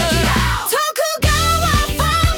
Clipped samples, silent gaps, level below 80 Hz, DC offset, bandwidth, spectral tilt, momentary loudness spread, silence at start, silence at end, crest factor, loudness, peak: under 0.1%; none; -24 dBFS; under 0.1%; 18 kHz; -3.5 dB/octave; 3 LU; 0 s; 0 s; 12 dB; -16 LUFS; -4 dBFS